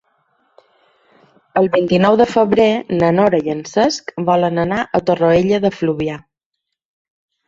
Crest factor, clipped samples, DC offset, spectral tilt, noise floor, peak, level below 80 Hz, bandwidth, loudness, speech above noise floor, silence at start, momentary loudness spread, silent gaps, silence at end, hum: 16 dB; under 0.1%; under 0.1%; -6.5 dB/octave; -78 dBFS; 0 dBFS; -50 dBFS; 7.8 kHz; -15 LUFS; 63 dB; 1.55 s; 7 LU; none; 1.3 s; none